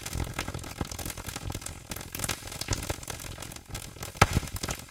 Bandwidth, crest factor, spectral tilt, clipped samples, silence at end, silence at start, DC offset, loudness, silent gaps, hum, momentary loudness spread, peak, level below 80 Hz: 17 kHz; 32 dB; -3.5 dB/octave; under 0.1%; 0 s; 0 s; under 0.1%; -33 LUFS; none; none; 14 LU; -2 dBFS; -42 dBFS